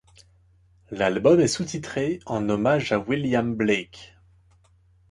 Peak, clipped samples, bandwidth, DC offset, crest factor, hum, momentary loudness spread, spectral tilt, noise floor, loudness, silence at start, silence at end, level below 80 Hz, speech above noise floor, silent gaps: -6 dBFS; under 0.1%; 11.5 kHz; under 0.1%; 18 dB; none; 10 LU; -5.5 dB/octave; -59 dBFS; -23 LUFS; 0.9 s; 1.05 s; -54 dBFS; 36 dB; none